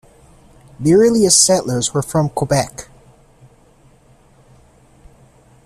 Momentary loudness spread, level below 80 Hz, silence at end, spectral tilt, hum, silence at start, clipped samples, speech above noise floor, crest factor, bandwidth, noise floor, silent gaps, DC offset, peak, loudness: 11 LU; -48 dBFS; 2.85 s; -4 dB/octave; none; 0.8 s; under 0.1%; 36 dB; 18 dB; 15 kHz; -50 dBFS; none; under 0.1%; 0 dBFS; -14 LUFS